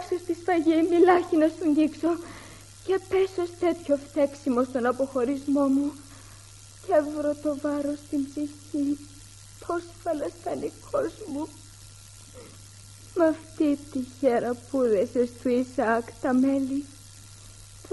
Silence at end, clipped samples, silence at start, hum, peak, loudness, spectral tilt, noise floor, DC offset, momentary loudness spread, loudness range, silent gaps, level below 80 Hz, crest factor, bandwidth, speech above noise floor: 0 s; under 0.1%; 0 s; none; -6 dBFS; -26 LUFS; -5.5 dB/octave; -48 dBFS; under 0.1%; 23 LU; 8 LU; none; -58 dBFS; 20 dB; 11.5 kHz; 22 dB